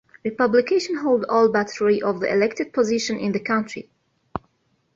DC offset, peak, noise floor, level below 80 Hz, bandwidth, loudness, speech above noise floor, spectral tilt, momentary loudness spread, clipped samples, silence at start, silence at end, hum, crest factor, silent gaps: under 0.1%; -4 dBFS; -67 dBFS; -60 dBFS; 7.8 kHz; -21 LUFS; 46 dB; -5 dB/octave; 17 LU; under 0.1%; 0.25 s; 0.6 s; none; 16 dB; none